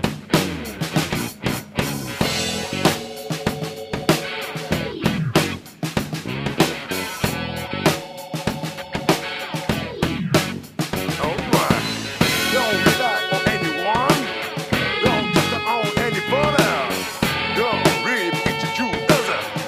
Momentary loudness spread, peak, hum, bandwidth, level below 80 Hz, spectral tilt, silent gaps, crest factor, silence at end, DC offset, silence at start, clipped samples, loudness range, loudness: 8 LU; -2 dBFS; none; 15.5 kHz; -44 dBFS; -4 dB/octave; none; 18 dB; 0 s; under 0.1%; 0 s; under 0.1%; 5 LU; -21 LUFS